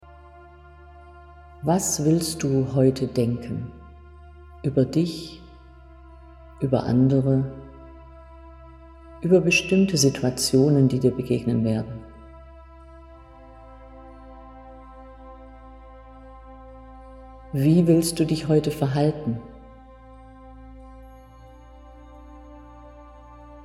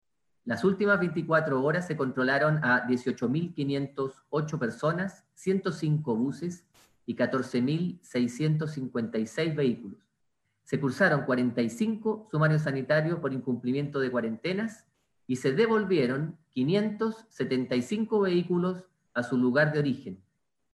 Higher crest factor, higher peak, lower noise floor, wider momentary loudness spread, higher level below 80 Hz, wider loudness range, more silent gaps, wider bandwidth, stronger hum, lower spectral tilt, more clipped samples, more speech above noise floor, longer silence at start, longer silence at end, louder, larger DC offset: about the same, 20 dB vs 18 dB; first, -6 dBFS vs -10 dBFS; second, -47 dBFS vs -78 dBFS; first, 27 LU vs 10 LU; first, -48 dBFS vs -70 dBFS; first, 16 LU vs 4 LU; neither; first, 16 kHz vs 12 kHz; neither; second, -5.5 dB/octave vs -7 dB/octave; neither; second, 26 dB vs 50 dB; first, 0.9 s vs 0.45 s; second, 0 s vs 0.55 s; first, -22 LUFS vs -28 LUFS; neither